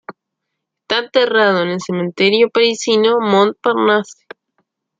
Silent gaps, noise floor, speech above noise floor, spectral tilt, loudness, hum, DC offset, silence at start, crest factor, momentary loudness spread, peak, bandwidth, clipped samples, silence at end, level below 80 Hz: none; -77 dBFS; 63 dB; -4 dB/octave; -14 LUFS; none; under 0.1%; 0.1 s; 16 dB; 7 LU; 0 dBFS; 9 kHz; under 0.1%; 0.85 s; -66 dBFS